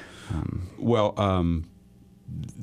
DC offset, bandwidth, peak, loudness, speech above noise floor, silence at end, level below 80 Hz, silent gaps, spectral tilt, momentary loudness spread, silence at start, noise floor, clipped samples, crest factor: under 0.1%; 11.5 kHz; -10 dBFS; -27 LUFS; 28 dB; 0 s; -42 dBFS; none; -7.5 dB/octave; 15 LU; 0 s; -53 dBFS; under 0.1%; 18 dB